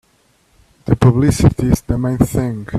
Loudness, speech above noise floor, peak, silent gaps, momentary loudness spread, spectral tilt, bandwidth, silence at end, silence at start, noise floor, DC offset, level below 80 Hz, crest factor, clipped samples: -15 LUFS; 43 dB; 0 dBFS; none; 8 LU; -7.5 dB/octave; 14.5 kHz; 0 s; 0.85 s; -57 dBFS; under 0.1%; -30 dBFS; 16 dB; under 0.1%